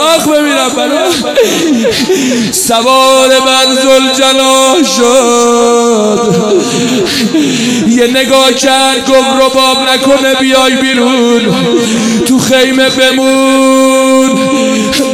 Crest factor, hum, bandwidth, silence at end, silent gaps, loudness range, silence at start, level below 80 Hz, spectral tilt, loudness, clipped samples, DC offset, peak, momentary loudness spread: 8 dB; none; 17.5 kHz; 0 s; none; 2 LU; 0 s; -44 dBFS; -3 dB/octave; -7 LUFS; 0.8%; under 0.1%; 0 dBFS; 4 LU